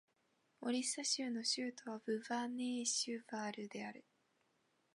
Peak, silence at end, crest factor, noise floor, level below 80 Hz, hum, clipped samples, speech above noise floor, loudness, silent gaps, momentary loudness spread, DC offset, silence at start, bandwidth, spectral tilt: -24 dBFS; 0.95 s; 20 dB; -80 dBFS; under -90 dBFS; none; under 0.1%; 38 dB; -41 LUFS; none; 10 LU; under 0.1%; 0.6 s; 11.5 kHz; -1.5 dB/octave